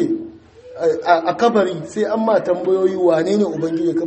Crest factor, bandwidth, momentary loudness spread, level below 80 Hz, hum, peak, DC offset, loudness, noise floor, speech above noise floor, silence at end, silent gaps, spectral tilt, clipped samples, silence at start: 16 dB; 8.6 kHz; 6 LU; -60 dBFS; none; 0 dBFS; under 0.1%; -18 LUFS; -39 dBFS; 23 dB; 0 s; none; -6.5 dB/octave; under 0.1%; 0 s